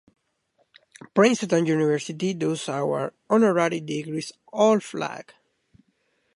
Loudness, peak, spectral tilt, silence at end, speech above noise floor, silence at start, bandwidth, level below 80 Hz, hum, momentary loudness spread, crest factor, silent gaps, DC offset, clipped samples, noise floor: -24 LUFS; -4 dBFS; -5.5 dB/octave; 1.15 s; 47 dB; 1.15 s; 11.5 kHz; -74 dBFS; none; 12 LU; 20 dB; none; under 0.1%; under 0.1%; -70 dBFS